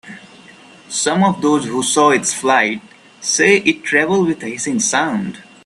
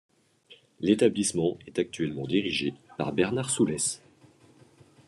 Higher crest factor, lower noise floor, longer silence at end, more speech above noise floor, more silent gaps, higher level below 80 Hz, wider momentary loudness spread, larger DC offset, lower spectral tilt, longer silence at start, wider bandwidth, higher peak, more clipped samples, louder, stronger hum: second, 16 dB vs 22 dB; second, -42 dBFS vs -58 dBFS; second, 0.25 s vs 1.1 s; second, 27 dB vs 31 dB; neither; about the same, -60 dBFS vs -64 dBFS; about the same, 10 LU vs 9 LU; neither; about the same, -3 dB/octave vs -4 dB/octave; second, 0.05 s vs 0.5 s; about the same, 13.5 kHz vs 12.5 kHz; first, 0 dBFS vs -8 dBFS; neither; first, -15 LUFS vs -28 LUFS; neither